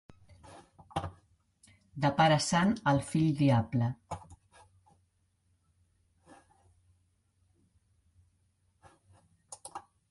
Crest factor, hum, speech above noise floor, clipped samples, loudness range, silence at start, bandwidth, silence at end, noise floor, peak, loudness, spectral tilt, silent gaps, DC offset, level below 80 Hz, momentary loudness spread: 22 dB; none; 46 dB; under 0.1%; 8 LU; 0.5 s; 11.5 kHz; 0.3 s; -74 dBFS; -12 dBFS; -29 LUFS; -5.5 dB/octave; none; under 0.1%; -60 dBFS; 22 LU